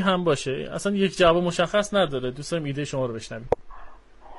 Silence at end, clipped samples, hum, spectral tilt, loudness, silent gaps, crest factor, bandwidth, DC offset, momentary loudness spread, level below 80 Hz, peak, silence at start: 0 s; under 0.1%; none; -5 dB/octave; -24 LUFS; none; 18 dB; 11.5 kHz; under 0.1%; 10 LU; -46 dBFS; -6 dBFS; 0 s